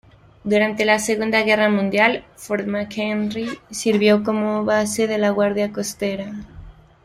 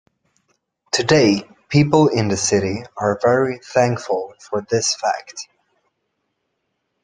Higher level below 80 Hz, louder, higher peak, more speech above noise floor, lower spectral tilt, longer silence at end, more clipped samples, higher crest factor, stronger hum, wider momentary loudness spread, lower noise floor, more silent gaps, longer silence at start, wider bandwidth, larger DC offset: about the same, -52 dBFS vs -54 dBFS; about the same, -20 LUFS vs -18 LUFS; about the same, -2 dBFS vs -2 dBFS; second, 22 dB vs 56 dB; about the same, -4.5 dB/octave vs -4.5 dB/octave; second, 0.35 s vs 1.6 s; neither; about the same, 18 dB vs 18 dB; neither; about the same, 11 LU vs 12 LU; second, -41 dBFS vs -73 dBFS; neither; second, 0.45 s vs 0.95 s; first, 16 kHz vs 10.5 kHz; neither